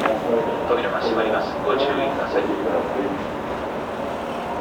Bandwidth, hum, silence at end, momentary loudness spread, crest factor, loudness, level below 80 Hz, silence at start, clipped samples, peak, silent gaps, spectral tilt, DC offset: 19 kHz; none; 0 s; 7 LU; 16 dB; -23 LUFS; -48 dBFS; 0 s; under 0.1%; -6 dBFS; none; -6 dB/octave; under 0.1%